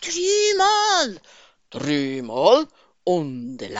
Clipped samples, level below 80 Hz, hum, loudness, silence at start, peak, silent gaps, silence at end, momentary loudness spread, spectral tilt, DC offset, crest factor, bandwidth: under 0.1%; -62 dBFS; none; -20 LUFS; 0 s; -2 dBFS; none; 0 s; 14 LU; -2 dB/octave; 0.1%; 18 dB; 8 kHz